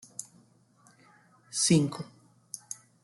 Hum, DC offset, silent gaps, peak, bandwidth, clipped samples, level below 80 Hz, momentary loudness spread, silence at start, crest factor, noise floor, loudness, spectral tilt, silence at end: none; under 0.1%; none; -12 dBFS; 12.5 kHz; under 0.1%; -68 dBFS; 20 LU; 0.2 s; 22 dB; -62 dBFS; -28 LUFS; -4.5 dB/octave; 0.3 s